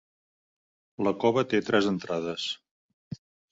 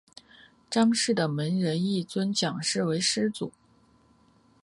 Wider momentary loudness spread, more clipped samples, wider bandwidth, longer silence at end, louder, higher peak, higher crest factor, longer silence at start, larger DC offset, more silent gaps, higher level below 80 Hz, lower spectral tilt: first, 20 LU vs 7 LU; neither; second, 8 kHz vs 11.5 kHz; second, 0.35 s vs 1.15 s; about the same, -27 LUFS vs -27 LUFS; first, -8 dBFS vs -12 dBFS; about the same, 20 dB vs 16 dB; first, 1 s vs 0.7 s; neither; first, 2.71-3.11 s vs none; about the same, -66 dBFS vs -70 dBFS; about the same, -5.5 dB/octave vs -4.5 dB/octave